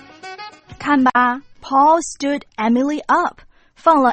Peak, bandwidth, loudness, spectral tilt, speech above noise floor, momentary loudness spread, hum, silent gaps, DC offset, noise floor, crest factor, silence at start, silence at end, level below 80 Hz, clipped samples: 0 dBFS; 8.8 kHz; -17 LUFS; -4 dB/octave; 20 dB; 20 LU; none; none; under 0.1%; -36 dBFS; 18 dB; 0.25 s; 0 s; -54 dBFS; under 0.1%